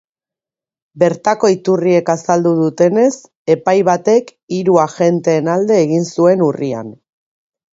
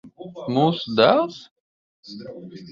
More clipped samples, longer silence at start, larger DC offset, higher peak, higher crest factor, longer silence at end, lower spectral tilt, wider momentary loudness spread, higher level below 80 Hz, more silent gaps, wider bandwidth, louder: neither; first, 0.95 s vs 0.05 s; neither; about the same, 0 dBFS vs -2 dBFS; second, 14 dB vs 20 dB; first, 0.8 s vs 0 s; about the same, -6.5 dB/octave vs -7 dB/octave; second, 6 LU vs 23 LU; about the same, -60 dBFS vs -64 dBFS; second, 3.35-3.45 s, 4.43-4.48 s vs 1.51-2.03 s; about the same, 8 kHz vs 7.4 kHz; first, -14 LUFS vs -20 LUFS